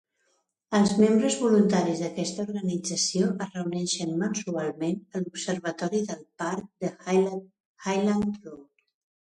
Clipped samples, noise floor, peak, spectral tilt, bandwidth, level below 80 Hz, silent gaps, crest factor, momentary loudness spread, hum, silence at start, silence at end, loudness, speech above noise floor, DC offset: under 0.1%; -73 dBFS; -10 dBFS; -5 dB/octave; 11 kHz; -66 dBFS; 7.60-7.75 s; 18 dB; 12 LU; none; 0.7 s; 0.75 s; -27 LUFS; 47 dB; under 0.1%